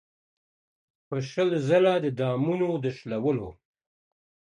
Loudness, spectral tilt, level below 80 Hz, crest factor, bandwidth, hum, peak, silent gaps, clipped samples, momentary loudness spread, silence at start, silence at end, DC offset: -26 LUFS; -7.5 dB/octave; -62 dBFS; 18 dB; 10 kHz; none; -10 dBFS; none; under 0.1%; 11 LU; 1.1 s; 1.05 s; under 0.1%